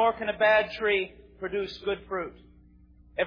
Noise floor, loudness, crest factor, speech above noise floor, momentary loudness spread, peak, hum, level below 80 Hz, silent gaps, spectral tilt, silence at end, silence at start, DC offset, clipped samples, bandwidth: -55 dBFS; -27 LUFS; 16 dB; 28 dB; 16 LU; -12 dBFS; 60 Hz at -55 dBFS; -56 dBFS; none; -5.5 dB/octave; 0 s; 0 s; under 0.1%; under 0.1%; 5.2 kHz